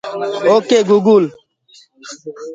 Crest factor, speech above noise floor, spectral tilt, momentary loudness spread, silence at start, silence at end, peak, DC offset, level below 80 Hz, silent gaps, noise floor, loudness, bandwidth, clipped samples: 14 dB; 35 dB; -5.5 dB/octave; 21 LU; 0.05 s; 0 s; 0 dBFS; under 0.1%; -66 dBFS; none; -49 dBFS; -13 LUFS; 7.8 kHz; under 0.1%